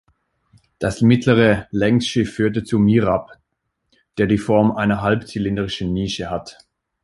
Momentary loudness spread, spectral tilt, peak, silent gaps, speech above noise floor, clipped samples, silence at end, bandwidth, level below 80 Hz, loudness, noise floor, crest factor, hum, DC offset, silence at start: 10 LU; -6.5 dB/octave; -2 dBFS; none; 57 dB; under 0.1%; 0.5 s; 11.5 kHz; -44 dBFS; -19 LUFS; -74 dBFS; 18 dB; none; under 0.1%; 0.8 s